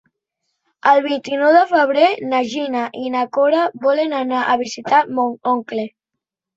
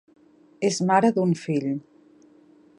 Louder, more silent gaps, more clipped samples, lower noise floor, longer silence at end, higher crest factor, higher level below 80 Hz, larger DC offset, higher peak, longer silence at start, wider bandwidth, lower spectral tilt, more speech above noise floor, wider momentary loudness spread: first, -17 LUFS vs -23 LUFS; neither; neither; first, -82 dBFS vs -55 dBFS; second, 0.7 s vs 1 s; about the same, 16 dB vs 20 dB; about the same, -68 dBFS vs -72 dBFS; neither; first, -2 dBFS vs -6 dBFS; first, 0.85 s vs 0.6 s; second, 8 kHz vs 11 kHz; second, -4 dB/octave vs -6 dB/octave; first, 66 dB vs 33 dB; about the same, 9 LU vs 10 LU